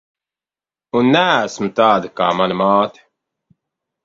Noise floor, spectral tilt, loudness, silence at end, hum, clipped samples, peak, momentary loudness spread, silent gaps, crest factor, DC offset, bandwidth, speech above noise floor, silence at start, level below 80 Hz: under -90 dBFS; -5.5 dB/octave; -16 LUFS; 1.15 s; none; under 0.1%; 0 dBFS; 7 LU; none; 18 dB; under 0.1%; 7.8 kHz; over 75 dB; 0.95 s; -60 dBFS